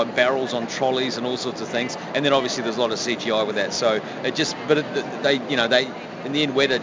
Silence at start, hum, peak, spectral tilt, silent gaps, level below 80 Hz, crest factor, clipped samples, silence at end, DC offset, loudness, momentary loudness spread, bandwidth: 0 s; none; -4 dBFS; -3.5 dB/octave; none; -62 dBFS; 18 dB; under 0.1%; 0 s; under 0.1%; -22 LUFS; 6 LU; 7.6 kHz